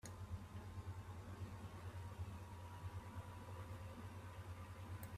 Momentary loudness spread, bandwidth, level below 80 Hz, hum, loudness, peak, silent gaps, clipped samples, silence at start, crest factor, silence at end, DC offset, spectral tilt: 2 LU; 15.5 kHz; -64 dBFS; none; -53 LUFS; -36 dBFS; none; under 0.1%; 0.05 s; 14 dB; 0 s; under 0.1%; -6 dB/octave